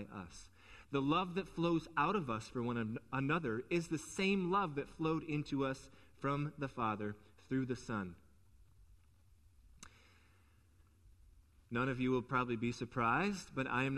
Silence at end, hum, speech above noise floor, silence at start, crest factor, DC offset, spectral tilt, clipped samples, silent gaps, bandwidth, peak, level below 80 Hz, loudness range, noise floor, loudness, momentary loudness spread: 0 s; none; 30 dB; 0 s; 18 dB; under 0.1%; -6 dB/octave; under 0.1%; none; 13 kHz; -20 dBFS; -64 dBFS; 9 LU; -68 dBFS; -38 LUFS; 15 LU